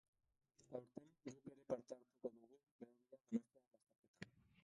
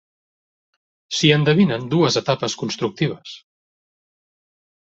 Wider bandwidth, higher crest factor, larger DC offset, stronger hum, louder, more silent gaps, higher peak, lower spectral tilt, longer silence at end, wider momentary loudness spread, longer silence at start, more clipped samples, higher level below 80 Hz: first, 10.5 kHz vs 8 kHz; about the same, 24 dB vs 20 dB; neither; neither; second, -54 LUFS vs -19 LUFS; first, 2.63-2.79 s, 3.67-3.71 s, 3.98-4.14 s vs none; second, -32 dBFS vs -2 dBFS; first, -6.5 dB/octave vs -5 dB/octave; second, 0.35 s vs 1.5 s; first, 15 LU vs 10 LU; second, 0.7 s vs 1.1 s; neither; second, -90 dBFS vs -58 dBFS